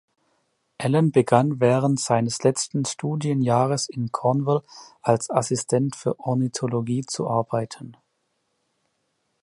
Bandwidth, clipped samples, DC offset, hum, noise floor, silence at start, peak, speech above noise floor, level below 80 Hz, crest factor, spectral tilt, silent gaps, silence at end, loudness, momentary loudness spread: 11.5 kHz; under 0.1%; under 0.1%; none; -73 dBFS; 0.8 s; -2 dBFS; 51 dB; -64 dBFS; 20 dB; -6 dB/octave; none; 1.5 s; -23 LUFS; 8 LU